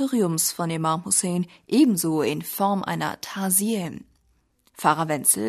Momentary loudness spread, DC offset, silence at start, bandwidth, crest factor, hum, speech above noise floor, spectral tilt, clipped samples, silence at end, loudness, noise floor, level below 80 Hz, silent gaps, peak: 9 LU; under 0.1%; 0 s; 13.5 kHz; 20 dB; none; 43 dB; -4 dB/octave; under 0.1%; 0 s; -23 LUFS; -66 dBFS; -66 dBFS; none; -4 dBFS